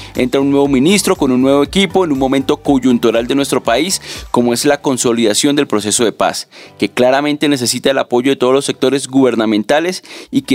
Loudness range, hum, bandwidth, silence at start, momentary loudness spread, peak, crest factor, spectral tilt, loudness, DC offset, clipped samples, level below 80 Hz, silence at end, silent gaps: 2 LU; none; 16.5 kHz; 0 s; 5 LU; 0 dBFS; 14 dB; -4 dB/octave; -13 LUFS; under 0.1%; under 0.1%; -42 dBFS; 0 s; none